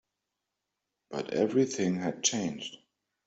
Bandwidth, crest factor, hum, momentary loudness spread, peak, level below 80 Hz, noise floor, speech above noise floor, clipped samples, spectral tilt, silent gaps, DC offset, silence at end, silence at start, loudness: 8.2 kHz; 20 dB; 50 Hz at -60 dBFS; 13 LU; -12 dBFS; -72 dBFS; -86 dBFS; 56 dB; under 0.1%; -4 dB/octave; none; under 0.1%; 0.5 s; 1.1 s; -30 LUFS